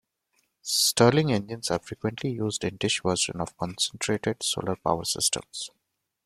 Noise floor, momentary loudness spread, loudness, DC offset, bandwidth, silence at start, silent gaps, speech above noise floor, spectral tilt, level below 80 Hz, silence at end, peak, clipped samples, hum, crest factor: -73 dBFS; 12 LU; -26 LUFS; under 0.1%; 16 kHz; 0.65 s; none; 46 dB; -3.5 dB/octave; -58 dBFS; 0.6 s; -6 dBFS; under 0.1%; none; 22 dB